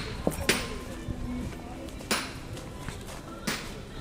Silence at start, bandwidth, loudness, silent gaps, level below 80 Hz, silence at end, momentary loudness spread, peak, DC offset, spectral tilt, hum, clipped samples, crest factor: 0 s; 16 kHz; -33 LUFS; none; -42 dBFS; 0 s; 13 LU; -8 dBFS; under 0.1%; -3.5 dB/octave; none; under 0.1%; 26 dB